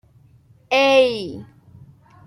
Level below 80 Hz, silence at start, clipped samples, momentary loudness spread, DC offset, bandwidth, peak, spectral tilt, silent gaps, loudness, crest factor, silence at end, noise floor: -62 dBFS; 0.7 s; under 0.1%; 19 LU; under 0.1%; 15 kHz; -4 dBFS; -4 dB/octave; none; -17 LUFS; 18 dB; 0.85 s; -52 dBFS